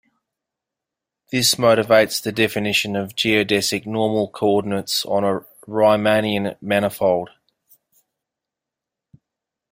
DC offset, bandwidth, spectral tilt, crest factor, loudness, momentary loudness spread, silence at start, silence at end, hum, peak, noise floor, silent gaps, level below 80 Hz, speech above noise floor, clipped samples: under 0.1%; 16.5 kHz; -3.5 dB/octave; 20 dB; -19 LUFS; 9 LU; 1.3 s; 2.45 s; none; -2 dBFS; -85 dBFS; none; -60 dBFS; 67 dB; under 0.1%